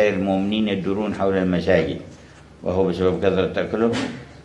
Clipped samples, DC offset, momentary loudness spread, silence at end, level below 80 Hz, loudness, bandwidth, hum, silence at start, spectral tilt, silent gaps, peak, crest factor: under 0.1%; under 0.1%; 9 LU; 0 s; -52 dBFS; -21 LUFS; 11 kHz; none; 0 s; -7 dB/octave; none; -2 dBFS; 18 dB